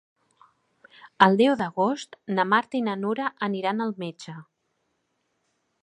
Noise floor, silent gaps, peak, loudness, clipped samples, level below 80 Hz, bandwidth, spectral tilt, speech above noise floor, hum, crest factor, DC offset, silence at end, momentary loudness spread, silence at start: -75 dBFS; none; 0 dBFS; -24 LUFS; under 0.1%; -74 dBFS; 10.5 kHz; -6 dB/octave; 51 dB; none; 26 dB; under 0.1%; 1.4 s; 16 LU; 1.05 s